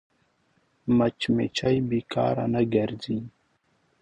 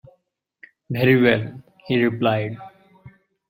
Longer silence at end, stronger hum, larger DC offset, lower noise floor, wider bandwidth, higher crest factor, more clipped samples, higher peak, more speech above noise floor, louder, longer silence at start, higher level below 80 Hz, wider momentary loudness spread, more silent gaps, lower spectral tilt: first, 0.7 s vs 0.4 s; neither; neither; about the same, -69 dBFS vs -68 dBFS; second, 9.6 kHz vs 16 kHz; about the same, 16 dB vs 20 dB; neither; second, -10 dBFS vs -2 dBFS; second, 44 dB vs 49 dB; second, -26 LUFS vs -20 LUFS; about the same, 0.85 s vs 0.9 s; about the same, -56 dBFS vs -58 dBFS; second, 9 LU vs 16 LU; neither; second, -7 dB/octave vs -9 dB/octave